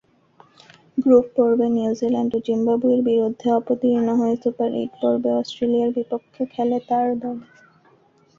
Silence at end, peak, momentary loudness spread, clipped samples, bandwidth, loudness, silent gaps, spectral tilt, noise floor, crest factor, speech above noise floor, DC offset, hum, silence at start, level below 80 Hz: 0.95 s; -4 dBFS; 10 LU; under 0.1%; 7.2 kHz; -21 LUFS; none; -7.5 dB/octave; -57 dBFS; 18 dB; 37 dB; under 0.1%; none; 0.95 s; -64 dBFS